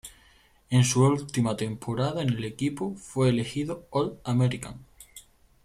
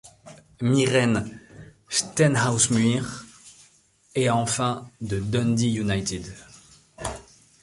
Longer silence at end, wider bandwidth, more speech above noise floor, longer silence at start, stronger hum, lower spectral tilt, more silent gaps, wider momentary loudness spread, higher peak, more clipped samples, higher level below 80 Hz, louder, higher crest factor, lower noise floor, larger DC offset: about the same, 0.45 s vs 0.4 s; first, 14 kHz vs 11.5 kHz; about the same, 33 dB vs 36 dB; about the same, 0.05 s vs 0.05 s; neither; first, -6 dB/octave vs -4.5 dB/octave; neither; about the same, 20 LU vs 18 LU; second, -10 dBFS vs -6 dBFS; neither; second, -56 dBFS vs -50 dBFS; second, -27 LUFS vs -24 LUFS; about the same, 18 dB vs 20 dB; about the same, -59 dBFS vs -59 dBFS; neither